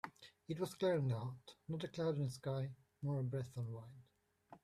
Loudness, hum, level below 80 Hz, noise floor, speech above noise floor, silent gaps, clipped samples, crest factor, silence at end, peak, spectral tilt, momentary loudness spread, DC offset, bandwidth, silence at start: -42 LUFS; none; -76 dBFS; -66 dBFS; 25 dB; none; under 0.1%; 16 dB; 0.05 s; -26 dBFS; -7 dB/octave; 15 LU; under 0.1%; 14 kHz; 0.05 s